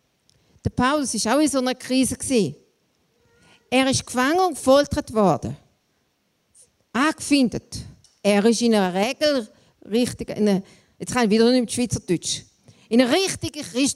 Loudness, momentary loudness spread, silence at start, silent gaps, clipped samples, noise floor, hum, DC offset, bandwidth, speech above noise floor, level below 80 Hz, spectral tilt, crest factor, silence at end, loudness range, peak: -21 LUFS; 11 LU; 0.65 s; none; under 0.1%; -69 dBFS; none; under 0.1%; 14.5 kHz; 48 dB; -50 dBFS; -4 dB/octave; 18 dB; 0 s; 2 LU; -4 dBFS